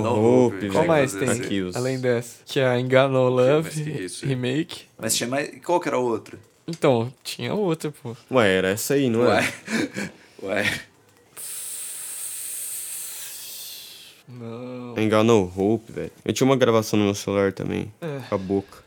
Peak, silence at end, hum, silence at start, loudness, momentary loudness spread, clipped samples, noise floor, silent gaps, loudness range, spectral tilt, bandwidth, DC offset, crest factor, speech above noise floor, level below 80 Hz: 0 dBFS; 0.05 s; none; 0 s; -23 LUFS; 15 LU; under 0.1%; -52 dBFS; none; 8 LU; -5 dB/octave; over 20 kHz; under 0.1%; 22 dB; 30 dB; -66 dBFS